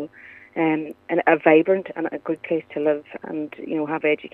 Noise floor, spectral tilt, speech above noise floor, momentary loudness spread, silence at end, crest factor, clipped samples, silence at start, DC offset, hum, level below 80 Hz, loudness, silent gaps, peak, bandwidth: -42 dBFS; -8.5 dB/octave; 21 dB; 14 LU; 0.05 s; 20 dB; under 0.1%; 0 s; under 0.1%; none; -74 dBFS; -22 LUFS; none; -2 dBFS; 3.9 kHz